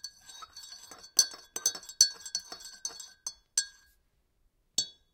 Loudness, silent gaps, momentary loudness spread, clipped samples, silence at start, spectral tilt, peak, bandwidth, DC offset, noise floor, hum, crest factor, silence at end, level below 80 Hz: -30 LUFS; none; 21 LU; under 0.1%; 0.05 s; 3 dB/octave; -4 dBFS; 18 kHz; under 0.1%; -72 dBFS; none; 32 dB; 0.25 s; -72 dBFS